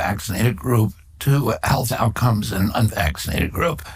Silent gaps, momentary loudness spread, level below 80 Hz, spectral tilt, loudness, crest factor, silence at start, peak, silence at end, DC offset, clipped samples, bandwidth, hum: none; 4 LU; -34 dBFS; -5.5 dB/octave; -20 LUFS; 16 dB; 0 s; -4 dBFS; 0 s; under 0.1%; under 0.1%; 16 kHz; none